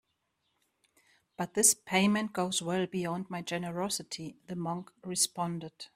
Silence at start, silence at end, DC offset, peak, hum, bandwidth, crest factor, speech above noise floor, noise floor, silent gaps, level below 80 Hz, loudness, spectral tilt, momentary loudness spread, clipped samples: 1.4 s; 0.1 s; under 0.1%; -10 dBFS; none; 15.5 kHz; 24 dB; 47 dB; -79 dBFS; none; -72 dBFS; -31 LUFS; -3 dB/octave; 15 LU; under 0.1%